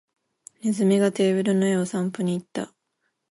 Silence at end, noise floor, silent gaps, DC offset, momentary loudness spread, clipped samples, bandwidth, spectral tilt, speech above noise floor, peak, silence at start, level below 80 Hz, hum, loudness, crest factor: 0.65 s; -76 dBFS; none; under 0.1%; 12 LU; under 0.1%; 11.5 kHz; -6.5 dB/octave; 53 dB; -10 dBFS; 0.65 s; -72 dBFS; none; -23 LUFS; 14 dB